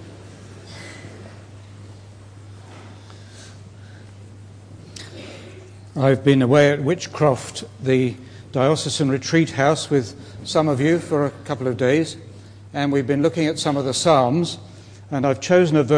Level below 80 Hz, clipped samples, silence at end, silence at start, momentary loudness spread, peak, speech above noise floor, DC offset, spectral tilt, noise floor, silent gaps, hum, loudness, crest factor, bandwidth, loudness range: -58 dBFS; under 0.1%; 0 s; 0 s; 25 LU; -2 dBFS; 23 dB; under 0.1%; -5.5 dB/octave; -41 dBFS; none; none; -20 LUFS; 18 dB; 10.5 kHz; 21 LU